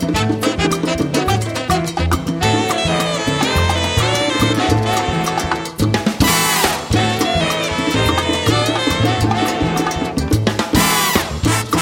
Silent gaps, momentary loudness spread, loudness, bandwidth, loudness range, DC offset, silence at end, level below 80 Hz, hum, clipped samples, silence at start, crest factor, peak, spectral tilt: none; 4 LU; -16 LUFS; 17.5 kHz; 1 LU; under 0.1%; 0 s; -32 dBFS; none; under 0.1%; 0 s; 16 dB; 0 dBFS; -4 dB/octave